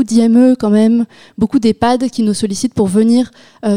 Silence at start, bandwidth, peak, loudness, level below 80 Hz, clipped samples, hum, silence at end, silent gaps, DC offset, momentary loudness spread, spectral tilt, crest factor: 0 s; 12 kHz; -2 dBFS; -13 LUFS; -46 dBFS; under 0.1%; none; 0 s; none; 0.7%; 9 LU; -6 dB/octave; 10 dB